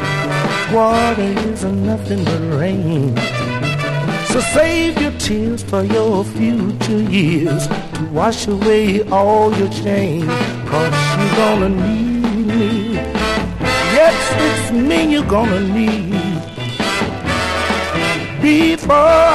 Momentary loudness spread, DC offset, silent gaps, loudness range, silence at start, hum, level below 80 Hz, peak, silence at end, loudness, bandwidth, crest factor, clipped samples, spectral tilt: 6 LU; 0.7%; none; 2 LU; 0 s; none; -34 dBFS; 0 dBFS; 0 s; -15 LUFS; 13 kHz; 14 dB; under 0.1%; -5.5 dB/octave